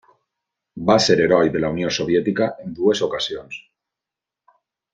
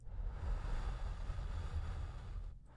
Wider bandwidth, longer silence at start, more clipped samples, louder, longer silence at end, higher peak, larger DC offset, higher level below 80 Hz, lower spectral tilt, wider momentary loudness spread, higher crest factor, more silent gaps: second, 9.4 kHz vs 10.5 kHz; first, 0.75 s vs 0 s; neither; first, -19 LUFS vs -46 LUFS; first, 1.35 s vs 0 s; first, -2 dBFS vs -30 dBFS; neither; second, -54 dBFS vs -42 dBFS; second, -4.5 dB/octave vs -6.5 dB/octave; first, 11 LU vs 5 LU; first, 20 dB vs 12 dB; neither